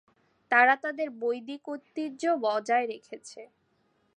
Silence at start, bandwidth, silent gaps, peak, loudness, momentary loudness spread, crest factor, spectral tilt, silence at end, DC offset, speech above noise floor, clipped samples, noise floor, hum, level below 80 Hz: 0.5 s; 10 kHz; none; -8 dBFS; -27 LUFS; 20 LU; 22 dB; -3 dB/octave; 0.7 s; under 0.1%; 43 dB; under 0.1%; -71 dBFS; none; -88 dBFS